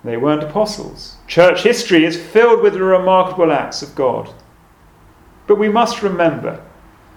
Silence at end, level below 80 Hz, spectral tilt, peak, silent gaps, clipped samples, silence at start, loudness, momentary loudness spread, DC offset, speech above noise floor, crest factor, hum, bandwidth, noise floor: 0.55 s; -48 dBFS; -5 dB/octave; 0 dBFS; none; under 0.1%; 0.05 s; -14 LUFS; 16 LU; under 0.1%; 33 dB; 16 dB; none; 16 kHz; -47 dBFS